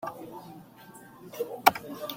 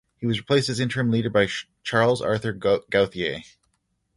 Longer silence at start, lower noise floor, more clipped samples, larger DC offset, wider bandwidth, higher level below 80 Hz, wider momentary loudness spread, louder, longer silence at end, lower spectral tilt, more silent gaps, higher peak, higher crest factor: second, 0 s vs 0.2 s; second, -51 dBFS vs -72 dBFS; neither; neither; first, 16.5 kHz vs 11.5 kHz; second, -70 dBFS vs -54 dBFS; first, 25 LU vs 7 LU; second, -28 LUFS vs -23 LUFS; second, 0 s vs 0.75 s; second, -3 dB/octave vs -5.5 dB/octave; neither; about the same, -2 dBFS vs -4 dBFS; first, 30 dB vs 20 dB